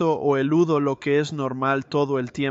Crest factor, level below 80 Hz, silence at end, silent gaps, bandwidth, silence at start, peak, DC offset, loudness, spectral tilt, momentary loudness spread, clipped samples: 14 dB; -62 dBFS; 0 s; none; 8 kHz; 0 s; -8 dBFS; under 0.1%; -22 LUFS; -7 dB/octave; 5 LU; under 0.1%